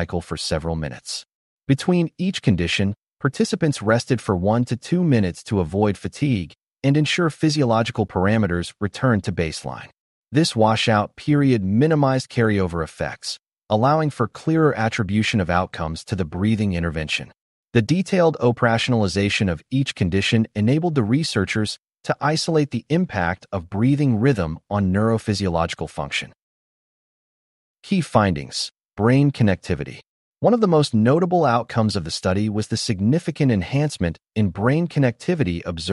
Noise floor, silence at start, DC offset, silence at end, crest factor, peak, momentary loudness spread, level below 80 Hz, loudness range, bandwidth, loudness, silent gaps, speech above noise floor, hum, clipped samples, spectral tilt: under -90 dBFS; 0 s; under 0.1%; 0 s; 18 dB; -4 dBFS; 9 LU; -46 dBFS; 3 LU; 11.5 kHz; -21 LUFS; 1.35-1.58 s, 6.72-6.76 s, 10.00-10.23 s, 17.41-17.64 s, 26.42-27.75 s, 28.85-28.89 s, 30.09-30.32 s; over 70 dB; none; under 0.1%; -6 dB/octave